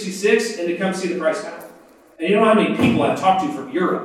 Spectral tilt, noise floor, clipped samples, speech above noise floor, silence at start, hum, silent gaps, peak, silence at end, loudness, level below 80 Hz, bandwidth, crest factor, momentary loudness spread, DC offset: -5.5 dB/octave; -47 dBFS; under 0.1%; 28 dB; 0 s; none; none; -2 dBFS; 0 s; -19 LUFS; -60 dBFS; 15 kHz; 16 dB; 11 LU; under 0.1%